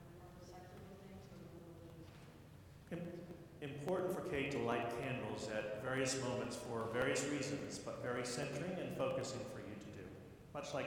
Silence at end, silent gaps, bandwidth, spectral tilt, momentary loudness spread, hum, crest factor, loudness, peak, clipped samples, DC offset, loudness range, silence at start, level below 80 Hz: 0 s; none; 18.5 kHz; -4.5 dB/octave; 18 LU; none; 20 dB; -43 LUFS; -24 dBFS; under 0.1%; under 0.1%; 12 LU; 0 s; -68 dBFS